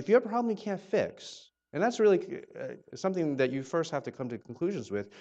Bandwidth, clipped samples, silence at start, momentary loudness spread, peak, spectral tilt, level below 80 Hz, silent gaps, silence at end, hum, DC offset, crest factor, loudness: 8.2 kHz; under 0.1%; 0 s; 16 LU; -12 dBFS; -6 dB/octave; -74 dBFS; none; 0 s; none; under 0.1%; 18 dB; -31 LUFS